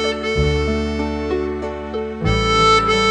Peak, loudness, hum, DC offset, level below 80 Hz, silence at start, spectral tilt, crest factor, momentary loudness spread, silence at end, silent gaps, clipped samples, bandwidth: -2 dBFS; -18 LUFS; none; under 0.1%; -28 dBFS; 0 s; -5 dB/octave; 16 dB; 13 LU; 0 s; none; under 0.1%; 9.8 kHz